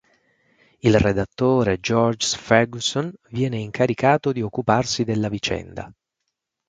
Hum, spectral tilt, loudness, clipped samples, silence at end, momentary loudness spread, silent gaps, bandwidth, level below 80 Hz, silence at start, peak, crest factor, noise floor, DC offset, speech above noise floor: none; -5 dB/octave; -21 LUFS; under 0.1%; 0.75 s; 9 LU; none; 9.4 kHz; -44 dBFS; 0.85 s; 0 dBFS; 22 dB; -79 dBFS; under 0.1%; 59 dB